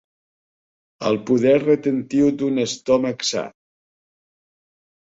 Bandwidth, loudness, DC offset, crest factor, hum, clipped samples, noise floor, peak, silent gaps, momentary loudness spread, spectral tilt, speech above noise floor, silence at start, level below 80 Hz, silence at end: 7.8 kHz; -20 LUFS; under 0.1%; 16 dB; none; under 0.1%; under -90 dBFS; -6 dBFS; none; 8 LU; -5 dB/octave; over 71 dB; 1 s; -60 dBFS; 1.55 s